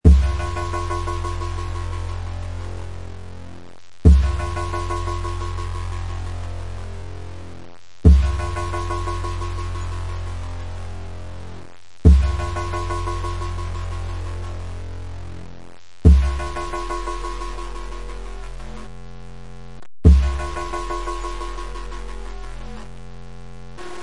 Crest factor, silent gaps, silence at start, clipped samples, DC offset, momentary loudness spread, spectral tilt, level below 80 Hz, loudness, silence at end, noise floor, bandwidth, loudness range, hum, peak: 22 dB; none; 0 s; under 0.1%; 2%; 24 LU; -7 dB/octave; -24 dBFS; -23 LUFS; 0 s; -45 dBFS; 11 kHz; 7 LU; none; 0 dBFS